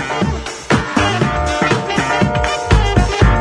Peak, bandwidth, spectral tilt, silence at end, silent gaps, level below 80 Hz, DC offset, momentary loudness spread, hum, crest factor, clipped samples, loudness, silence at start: 0 dBFS; 10.5 kHz; -5.5 dB/octave; 0 s; none; -22 dBFS; under 0.1%; 5 LU; none; 14 dB; under 0.1%; -15 LUFS; 0 s